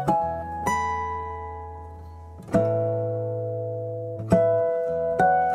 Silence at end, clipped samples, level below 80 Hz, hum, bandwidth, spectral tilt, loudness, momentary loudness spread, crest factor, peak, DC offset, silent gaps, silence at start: 0 s; under 0.1%; -46 dBFS; none; 14 kHz; -7 dB/octave; -25 LUFS; 18 LU; 18 dB; -6 dBFS; under 0.1%; none; 0 s